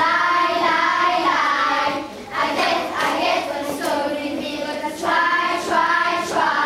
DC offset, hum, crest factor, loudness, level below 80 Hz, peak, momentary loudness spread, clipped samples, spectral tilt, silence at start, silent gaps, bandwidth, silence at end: under 0.1%; none; 14 dB; -19 LUFS; -58 dBFS; -6 dBFS; 8 LU; under 0.1%; -2.5 dB/octave; 0 s; none; 16 kHz; 0 s